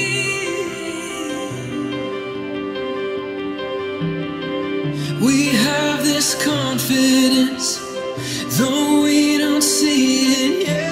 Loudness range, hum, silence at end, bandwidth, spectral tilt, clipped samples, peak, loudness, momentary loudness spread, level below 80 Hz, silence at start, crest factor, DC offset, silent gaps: 8 LU; none; 0 s; 16 kHz; -3.5 dB/octave; under 0.1%; -4 dBFS; -18 LUFS; 11 LU; -54 dBFS; 0 s; 16 dB; under 0.1%; none